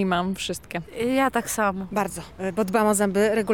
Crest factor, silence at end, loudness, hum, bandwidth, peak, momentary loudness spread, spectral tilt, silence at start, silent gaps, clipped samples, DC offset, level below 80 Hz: 14 dB; 0 s; -24 LUFS; none; 19.5 kHz; -10 dBFS; 10 LU; -4.5 dB/octave; 0 s; none; under 0.1%; 0.2%; -52 dBFS